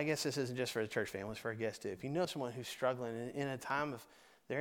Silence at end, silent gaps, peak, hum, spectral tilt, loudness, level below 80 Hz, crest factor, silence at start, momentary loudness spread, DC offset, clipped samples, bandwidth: 0 s; none; -20 dBFS; none; -4.5 dB/octave; -40 LUFS; -74 dBFS; 18 dB; 0 s; 5 LU; under 0.1%; under 0.1%; 19 kHz